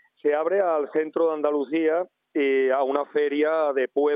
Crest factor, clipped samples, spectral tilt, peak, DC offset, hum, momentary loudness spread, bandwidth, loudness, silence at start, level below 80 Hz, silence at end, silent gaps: 14 dB; under 0.1%; -8 dB/octave; -10 dBFS; under 0.1%; none; 4 LU; 4.9 kHz; -24 LUFS; 0.25 s; under -90 dBFS; 0 s; none